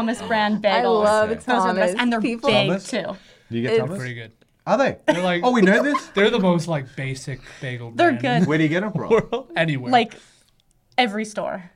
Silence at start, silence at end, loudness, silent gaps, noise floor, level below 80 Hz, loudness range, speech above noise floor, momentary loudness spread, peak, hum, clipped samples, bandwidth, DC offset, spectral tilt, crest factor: 0 s; 0.1 s; -20 LUFS; none; -61 dBFS; -54 dBFS; 3 LU; 40 dB; 13 LU; -2 dBFS; none; under 0.1%; 12.5 kHz; under 0.1%; -5.5 dB/octave; 18 dB